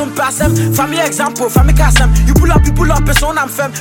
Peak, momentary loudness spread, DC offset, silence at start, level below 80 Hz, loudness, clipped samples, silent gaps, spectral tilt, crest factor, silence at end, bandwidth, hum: 0 dBFS; 5 LU; under 0.1%; 0 s; -14 dBFS; -12 LUFS; under 0.1%; none; -5 dB/octave; 10 dB; 0 s; 17.5 kHz; none